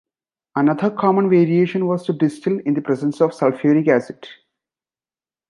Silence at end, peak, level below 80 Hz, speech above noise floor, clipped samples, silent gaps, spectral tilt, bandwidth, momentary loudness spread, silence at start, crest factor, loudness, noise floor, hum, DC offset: 1.15 s; -2 dBFS; -70 dBFS; over 73 dB; under 0.1%; none; -8.5 dB/octave; 11 kHz; 7 LU; 0.55 s; 16 dB; -18 LUFS; under -90 dBFS; none; under 0.1%